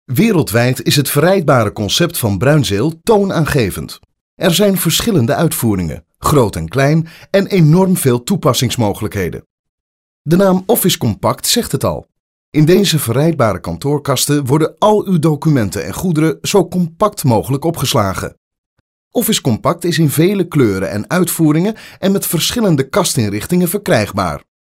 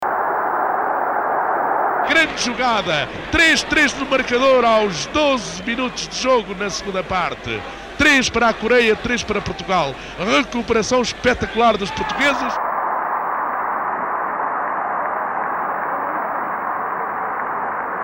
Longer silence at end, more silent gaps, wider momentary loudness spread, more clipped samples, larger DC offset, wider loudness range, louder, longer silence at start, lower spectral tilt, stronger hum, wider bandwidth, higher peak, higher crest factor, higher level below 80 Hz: first, 0.35 s vs 0 s; first, 4.21-4.37 s, 9.46-10.25 s, 12.20-12.52 s, 18.37-18.51 s, 18.58-19.11 s vs none; about the same, 8 LU vs 9 LU; neither; neither; second, 2 LU vs 6 LU; first, -14 LUFS vs -19 LUFS; about the same, 0.1 s vs 0 s; first, -5 dB/octave vs -3 dB/octave; neither; about the same, 16.5 kHz vs 16 kHz; first, -2 dBFS vs -6 dBFS; about the same, 12 dB vs 14 dB; about the same, -40 dBFS vs -44 dBFS